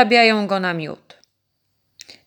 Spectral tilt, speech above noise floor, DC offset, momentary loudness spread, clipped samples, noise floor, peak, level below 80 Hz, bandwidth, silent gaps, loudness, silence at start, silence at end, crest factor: -5 dB/octave; 54 dB; under 0.1%; 20 LU; under 0.1%; -71 dBFS; 0 dBFS; -72 dBFS; 19.5 kHz; none; -17 LUFS; 0 s; 1.3 s; 20 dB